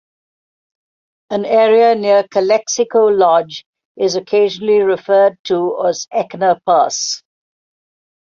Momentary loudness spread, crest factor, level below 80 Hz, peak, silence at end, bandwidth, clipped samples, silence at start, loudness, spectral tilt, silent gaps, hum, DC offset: 10 LU; 14 dB; -64 dBFS; -2 dBFS; 1.1 s; 7.6 kHz; under 0.1%; 1.3 s; -14 LUFS; -3.5 dB/octave; 3.66-3.73 s, 3.85-3.95 s, 5.39-5.44 s; none; under 0.1%